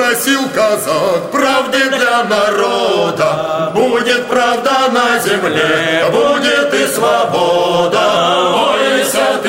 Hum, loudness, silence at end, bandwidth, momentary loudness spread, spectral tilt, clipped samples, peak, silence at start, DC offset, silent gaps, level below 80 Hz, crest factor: none; -12 LUFS; 0 s; 16.5 kHz; 2 LU; -3 dB/octave; under 0.1%; 0 dBFS; 0 s; under 0.1%; none; -52 dBFS; 12 dB